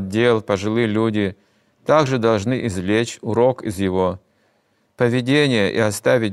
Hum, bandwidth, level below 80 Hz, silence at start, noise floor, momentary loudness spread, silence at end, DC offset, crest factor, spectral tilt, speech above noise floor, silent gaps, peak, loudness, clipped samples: none; 14 kHz; -58 dBFS; 0 s; -64 dBFS; 6 LU; 0 s; under 0.1%; 18 dB; -6 dB/octave; 45 dB; none; -2 dBFS; -19 LUFS; under 0.1%